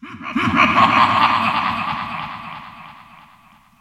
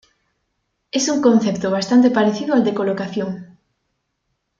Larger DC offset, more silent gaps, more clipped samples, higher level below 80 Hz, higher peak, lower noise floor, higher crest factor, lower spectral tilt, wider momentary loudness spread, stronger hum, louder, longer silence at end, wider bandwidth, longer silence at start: neither; neither; neither; first, -50 dBFS vs -62 dBFS; about the same, 0 dBFS vs -2 dBFS; second, -50 dBFS vs -73 dBFS; about the same, 20 dB vs 18 dB; about the same, -5 dB/octave vs -5 dB/octave; first, 20 LU vs 11 LU; neither; about the same, -16 LUFS vs -18 LUFS; second, 0.8 s vs 1.15 s; first, 13.5 kHz vs 7.6 kHz; second, 0 s vs 0.95 s